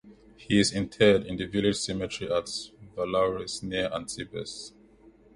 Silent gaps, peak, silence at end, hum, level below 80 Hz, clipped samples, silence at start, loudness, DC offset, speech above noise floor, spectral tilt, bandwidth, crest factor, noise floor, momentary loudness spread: none; -8 dBFS; 0.65 s; none; -54 dBFS; under 0.1%; 0.05 s; -28 LUFS; under 0.1%; 29 dB; -4.5 dB/octave; 11.5 kHz; 20 dB; -56 dBFS; 14 LU